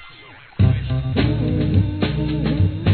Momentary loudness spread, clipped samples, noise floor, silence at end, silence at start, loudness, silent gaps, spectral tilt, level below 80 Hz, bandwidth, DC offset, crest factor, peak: 3 LU; under 0.1%; -43 dBFS; 0 s; 0 s; -20 LUFS; none; -11 dB/octave; -30 dBFS; 4.5 kHz; 0.2%; 14 dB; -4 dBFS